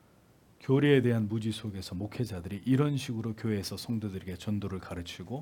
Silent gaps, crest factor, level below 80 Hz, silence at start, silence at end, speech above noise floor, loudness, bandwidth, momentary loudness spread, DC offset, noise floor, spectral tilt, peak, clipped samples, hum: none; 20 dB; -64 dBFS; 0.6 s; 0 s; 31 dB; -31 LUFS; 17.5 kHz; 14 LU; under 0.1%; -61 dBFS; -7 dB/octave; -12 dBFS; under 0.1%; none